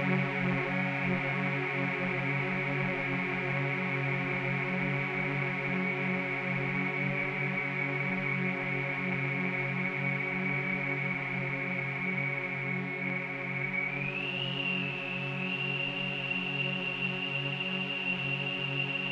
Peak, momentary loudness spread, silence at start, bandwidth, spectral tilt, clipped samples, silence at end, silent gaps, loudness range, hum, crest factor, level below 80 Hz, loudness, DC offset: -16 dBFS; 2 LU; 0 s; 7.4 kHz; -7 dB/octave; under 0.1%; 0 s; none; 1 LU; none; 16 dB; -70 dBFS; -31 LUFS; under 0.1%